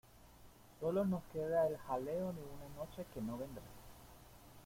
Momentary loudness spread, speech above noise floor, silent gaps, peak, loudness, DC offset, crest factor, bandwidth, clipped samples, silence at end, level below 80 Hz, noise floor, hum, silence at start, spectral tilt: 23 LU; 21 dB; none; -26 dBFS; -41 LUFS; under 0.1%; 16 dB; 16.5 kHz; under 0.1%; 0 s; -64 dBFS; -61 dBFS; none; 0.05 s; -7.5 dB/octave